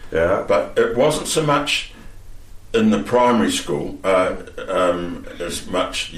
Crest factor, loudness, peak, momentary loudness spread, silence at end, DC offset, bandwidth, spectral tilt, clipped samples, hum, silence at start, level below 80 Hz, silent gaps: 14 dB; -19 LUFS; -6 dBFS; 11 LU; 0 s; under 0.1%; 15 kHz; -4 dB/octave; under 0.1%; none; 0 s; -40 dBFS; none